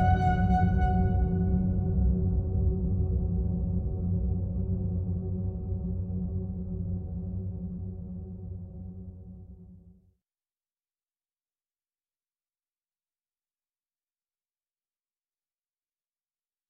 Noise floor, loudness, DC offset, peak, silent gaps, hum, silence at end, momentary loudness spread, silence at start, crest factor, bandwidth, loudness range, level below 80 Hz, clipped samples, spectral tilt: under -90 dBFS; -30 LUFS; under 0.1%; -14 dBFS; none; none; 6.8 s; 16 LU; 0 s; 18 dB; 4.7 kHz; 18 LU; -36 dBFS; under 0.1%; -10.5 dB/octave